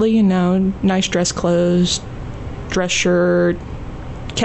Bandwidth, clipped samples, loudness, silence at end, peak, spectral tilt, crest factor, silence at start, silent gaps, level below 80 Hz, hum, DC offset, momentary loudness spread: 8.4 kHz; under 0.1%; -17 LUFS; 0 s; -6 dBFS; -5 dB/octave; 10 dB; 0 s; none; -36 dBFS; none; under 0.1%; 16 LU